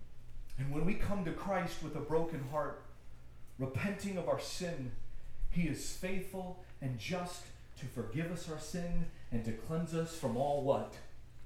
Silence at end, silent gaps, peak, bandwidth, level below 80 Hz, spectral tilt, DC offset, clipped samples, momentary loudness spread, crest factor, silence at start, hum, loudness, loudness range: 0 s; none; -18 dBFS; 15 kHz; -46 dBFS; -6 dB/octave; under 0.1%; under 0.1%; 18 LU; 18 dB; 0 s; none; -39 LUFS; 3 LU